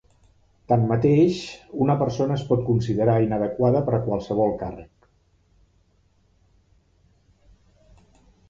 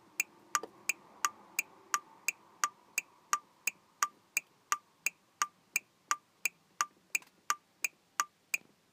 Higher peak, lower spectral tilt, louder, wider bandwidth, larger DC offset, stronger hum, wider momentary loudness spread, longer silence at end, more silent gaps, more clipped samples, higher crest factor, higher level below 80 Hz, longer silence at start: first, -6 dBFS vs -10 dBFS; first, -8.5 dB/octave vs 2 dB/octave; first, -22 LUFS vs -37 LUFS; second, 7.6 kHz vs 15.5 kHz; neither; neither; first, 11 LU vs 3 LU; first, 3.65 s vs 0.35 s; neither; neither; second, 18 dB vs 30 dB; first, -50 dBFS vs under -90 dBFS; first, 0.7 s vs 0.2 s